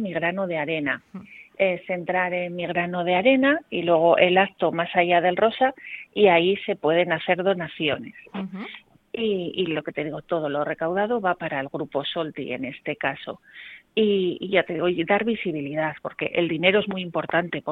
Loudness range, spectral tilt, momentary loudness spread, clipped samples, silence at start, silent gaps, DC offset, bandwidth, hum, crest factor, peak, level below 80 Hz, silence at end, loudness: 7 LU; -8 dB/octave; 13 LU; under 0.1%; 0 s; none; under 0.1%; 4.3 kHz; none; 20 dB; -2 dBFS; -64 dBFS; 0 s; -23 LUFS